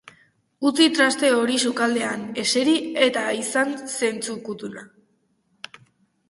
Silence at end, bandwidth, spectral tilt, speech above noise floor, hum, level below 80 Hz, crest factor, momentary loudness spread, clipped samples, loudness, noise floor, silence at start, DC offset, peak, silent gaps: 1.45 s; 12 kHz; -2 dB/octave; 45 dB; none; -70 dBFS; 20 dB; 19 LU; under 0.1%; -21 LUFS; -67 dBFS; 0.6 s; under 0.1%; -4 dBFS; none